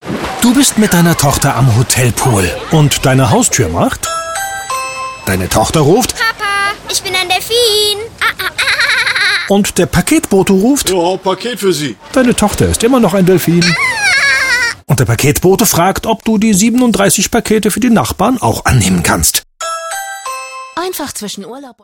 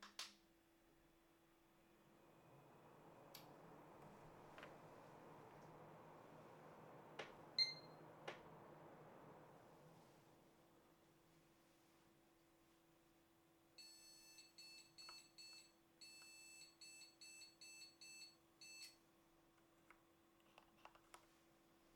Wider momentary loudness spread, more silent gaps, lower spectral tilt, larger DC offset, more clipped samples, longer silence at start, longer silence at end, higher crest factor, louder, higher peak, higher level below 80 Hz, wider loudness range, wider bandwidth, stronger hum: about the same, 10 LU vs 10 LU; neither; first, -4 dB/octave vs -2 dB/octave; neither; neither; about the same, 0.05 s vs 0 s; about the same, 0.1 s vs 0 s; second, 12 dB vs 32 dB; first, -11 LUFS vs -56 LUFS; first, 0 dBFS vs -30 dBFS; first, -32 dBFS vs -88 dBFS; second, 3 LU vs 17 LU; about the same, 18 kHz vs 19 kHz; neither